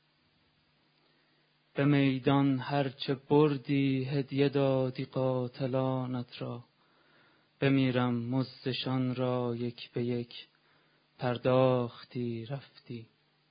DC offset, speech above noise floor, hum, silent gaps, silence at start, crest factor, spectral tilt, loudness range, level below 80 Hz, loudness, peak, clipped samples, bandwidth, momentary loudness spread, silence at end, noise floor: under 0.1%; 40 dB; none; none; 1.75 s; 20 dB; -11 dB/octave; 5 LU; -70 dBFS; -31 LUFS; -12 dBFS; under 0.1%; 5.2 kHz; 14 LU; 0.45 s; -70 dBFS